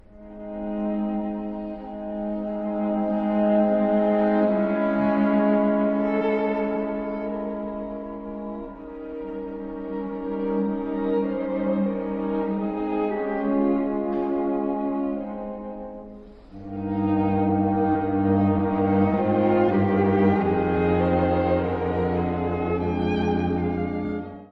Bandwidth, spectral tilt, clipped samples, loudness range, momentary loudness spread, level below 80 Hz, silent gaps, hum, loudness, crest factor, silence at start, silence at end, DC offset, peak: 5 kHz; -10.5 dB/octave; under 0.1%; 8 LU; 13 LU; -48 dBFS; none; none; -24 LUFS; 16 dB; 0.15 s; 0.05 s; under 0.1%; -8 dBFS